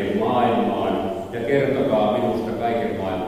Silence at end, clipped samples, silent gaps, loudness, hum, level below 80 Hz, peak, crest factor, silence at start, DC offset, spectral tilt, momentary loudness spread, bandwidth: 0 s; under 0.1%; none; -21 LUFS; none; -50 dBFS; -6 dBFS; 14 dB; 0 s; under 0.1%; -7.5 dB/octave; 6 LU; 15.5 kHz